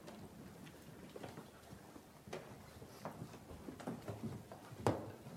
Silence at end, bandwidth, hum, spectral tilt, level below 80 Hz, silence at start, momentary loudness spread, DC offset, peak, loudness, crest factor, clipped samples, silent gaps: 0 s; 16.5 kHz; none; -6 dB/octave; -68 dBFS; 0 s; 16 LU; under 0.1%; -18 dBFS; -49 LUFS; 30 dB; under 0.1%; none